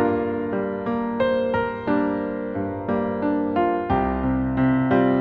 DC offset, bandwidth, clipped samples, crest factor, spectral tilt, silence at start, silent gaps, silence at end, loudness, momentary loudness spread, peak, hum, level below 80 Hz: under 0.1%; 4.8 kHz; under 0.1%; 16 dB; -10 dB/octave; 0 s; none; 0 s; -23 LUFS; 6 LU; -6 dBFS; none; -40 dBFS